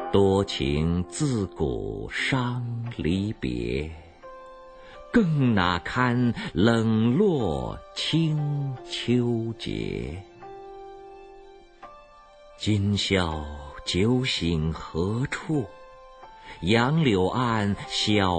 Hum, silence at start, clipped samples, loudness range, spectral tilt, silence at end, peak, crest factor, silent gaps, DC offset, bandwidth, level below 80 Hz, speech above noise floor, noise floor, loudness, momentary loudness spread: none; 0 s; under 0.1%; 7 LU; -6 dB/octave; 0 s; -6 dBFS; 20 dB; none; under 0.1%; 9.2 kHz; -44 dBFS; 26 dB; -50 dBFS; -25 LUFS; 21 LU